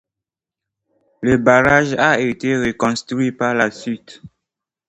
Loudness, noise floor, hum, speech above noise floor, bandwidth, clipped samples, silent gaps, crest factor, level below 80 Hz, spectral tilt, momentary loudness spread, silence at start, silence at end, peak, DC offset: -16 LUFS; -86 dBFS; none; 70 dB; 8.8 kHz; under 0.1%; none; 18 dB; -48 dBFS; -5.5 dB/octave; 11 LU; 1.2 s; 0.6 s; 0 dBFS; under 0.1%